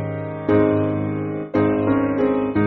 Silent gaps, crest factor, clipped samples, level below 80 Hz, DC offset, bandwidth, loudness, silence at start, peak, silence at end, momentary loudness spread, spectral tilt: none; 16 dB; under 0.1%; -48 dBFS; under 0.1%; 4.4 kHz; -20 LUFS; 0 s; -4 dBFS; 0 s; 8 LU; -8 dB/octave